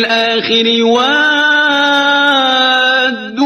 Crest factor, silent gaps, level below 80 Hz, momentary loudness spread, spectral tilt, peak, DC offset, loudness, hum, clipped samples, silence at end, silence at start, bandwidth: 10 dB; none; -60 dBFS; 2 LU; -2.5 dB/octave; 0 dBFS; under 0.1%; -10 LUFS; none; under 0.1%; 0 s; 0 s; 13.5 kHz